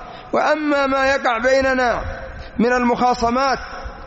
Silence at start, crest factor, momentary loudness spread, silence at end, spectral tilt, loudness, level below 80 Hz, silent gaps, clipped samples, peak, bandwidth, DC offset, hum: 0 s; 12 dB; 11 LU; 0 s; -3 dB/octave; -18 LUFS; -38 dBFS; none; under 0.1%; -6 dBFS; 8 kHz; under 0.1%; none